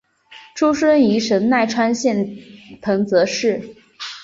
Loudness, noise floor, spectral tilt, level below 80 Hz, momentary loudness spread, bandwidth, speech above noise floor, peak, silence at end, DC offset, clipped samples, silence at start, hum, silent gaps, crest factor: -18 LUFS; -45 dBFS; -5 dB/octave; -58 dBFS; 16 LU; 7.8 kHz; 28 dB; -4 dBFS; 0 s; under 0.1%; under 0.1%; 0.3 s; none; none; 16 dB